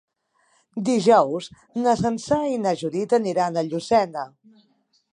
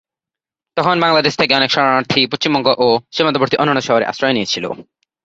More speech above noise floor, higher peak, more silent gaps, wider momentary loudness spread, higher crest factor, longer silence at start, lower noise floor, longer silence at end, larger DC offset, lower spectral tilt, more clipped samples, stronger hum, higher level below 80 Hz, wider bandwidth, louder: second, 44 dB vs 73 dB; second, -4 dBFS vs 0 dBFS; neither; first, 14 LU vs 7 LU; about the same, 18 dB vs 16 dB; about the same, 0.75 s vs 0.75 s; second, -66 dBFS vs -88 dBFS; first, 0.85 s vs 0.4 s; neither; about the same, -5.5 dB/octave vs -4.5 dB/octave; neither; neither; about the same, -60 dBFS vs -56 dBFS; first, 11 kHz vs 8 kHz; second, -22 LUFS vs -15 LUFS